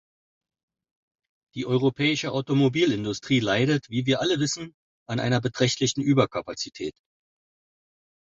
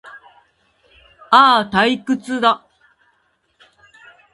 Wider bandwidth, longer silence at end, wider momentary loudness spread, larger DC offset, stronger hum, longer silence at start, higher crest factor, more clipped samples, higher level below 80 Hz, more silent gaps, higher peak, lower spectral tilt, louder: second, 8 kHz vs 11.5 kHz; second, 1.35 s vs 1.75 s; about the same, 11 LU vs 11 LU; neither; neither; first, 1.55 s vs 0.15 s; about the same, 20 dB vs 20 dB; neither; about the same, -60 dBFS vs -58 dBFS; first, 4.74-5.06 s vs none; second, -6 dBFS vs 0 dBFS; about the same, -5 dB/octave vs -4.5 dB/octave; second, -24 LUFS vs -15 LUFS